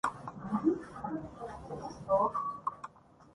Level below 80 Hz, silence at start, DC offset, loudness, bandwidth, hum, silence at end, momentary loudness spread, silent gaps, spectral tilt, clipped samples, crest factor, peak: -62 dBFS; 0.05 s; under 0.1%; -35 LUFS; 11.5 kHz; none; 0.1 s; 15 LU; none; -7 dB/octave; under 0.1%; 20 dB; -16 dBFS